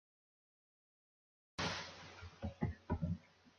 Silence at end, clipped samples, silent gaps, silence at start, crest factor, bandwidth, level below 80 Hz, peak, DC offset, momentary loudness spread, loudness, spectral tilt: 0.1 s; under 0.1%; none; 1.6 s; 20 dB; 10 kHz; -56 dBFS; -26 dBFS; under 0.1%; 11 LU; -44 LUFS; -5 dB/octave